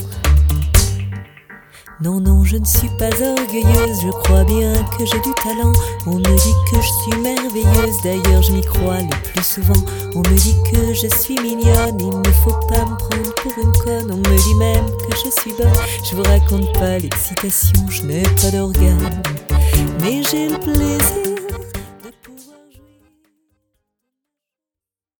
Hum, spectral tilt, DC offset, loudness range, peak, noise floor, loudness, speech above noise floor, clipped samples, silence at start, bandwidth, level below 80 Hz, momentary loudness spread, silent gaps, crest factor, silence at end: none; -5 dB/octave; under 0.1%; 3 LU; 0 dBFS; -89 dBFS; -15 LUFS; 75 dB; under 0.1%; 0 s; over 20 kHz; -20 dBFS; 7 LU; none; 16 dB; 2.8 s